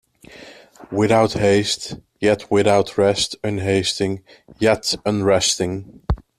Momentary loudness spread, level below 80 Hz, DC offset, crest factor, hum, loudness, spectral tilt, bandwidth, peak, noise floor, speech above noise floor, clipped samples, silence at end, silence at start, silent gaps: 11 LU; -40 dBFS; under 0.1%; 16 dB; none; -19 LUFS; -4.5 dB/octave; 14.5 kHz; -2 dBFS; -43 dBFS; 24 dB; under 0.1%; 0.2 s; 0.3 s; none